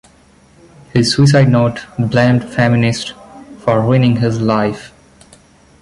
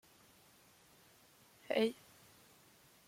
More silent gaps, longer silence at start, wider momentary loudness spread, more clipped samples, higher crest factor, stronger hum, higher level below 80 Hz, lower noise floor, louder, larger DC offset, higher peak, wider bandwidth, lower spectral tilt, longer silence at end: neither; second, 0.95 s vs 1.7 s; second, 10 LU vs 28 LU; neither; second, 14 dB vs 24 dB; neither; first, -44 dBFS vs -84 dBFS; second, -47 dBFS vs -66 dBFS; first, -14 LUFS vs -37 LUFS; neither; first, -2 dBFS vs -20 dBFS; second, 11.5 kHz vs 16.5 kHz; first, -6.5 dB/octave vs -4.5 dB/octave; second, 0.95 s vs 1.15 s